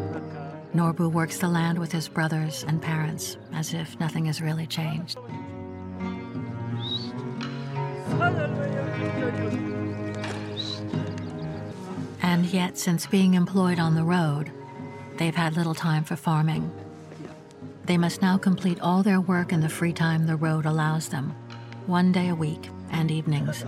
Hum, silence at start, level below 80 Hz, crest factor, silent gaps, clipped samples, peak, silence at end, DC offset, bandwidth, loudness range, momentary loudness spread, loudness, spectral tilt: none; 0 s; -62 dBFS; 18 dB; none; under 0.1%; -8 dBFS; 0 s; under 0.1%; 14.5 kHz; 6 LU; 13 LU; -26 LUFS; -6 dB/octave